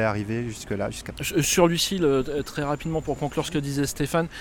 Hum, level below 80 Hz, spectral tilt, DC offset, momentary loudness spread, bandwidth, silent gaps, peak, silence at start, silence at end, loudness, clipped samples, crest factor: none; -44 dBFS; -4.5 dB/octave; under 0.1%; 10 LU; 18 kHz; none; -6 dBFS; 0 s; 0 s; -25 LUFS; under 0.1%; 20 dB